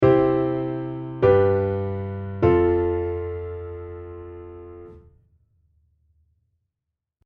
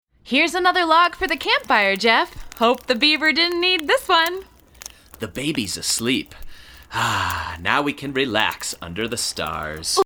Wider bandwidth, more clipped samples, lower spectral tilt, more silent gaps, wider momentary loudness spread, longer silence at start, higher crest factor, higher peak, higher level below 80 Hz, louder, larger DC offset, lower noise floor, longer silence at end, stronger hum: second, 5.2 kHz vs over 20 kHz; neither; first, -10.5 dB/octave vs -2.5 dB/octave; neither; first, 22 LU vs 12 LU; second, 0 s vs 0.25 s; about the same, 20 dB vs 20 dB; about the same, -4 dBFS vs -2 dBFS; about the same, -44 dBFS vs -46 dBFS; second, -22 LUFS vs -19 LUFS; neither; first, -84 dBFS vs -42 dBFS; first, 2.25 s vs 0 s; neither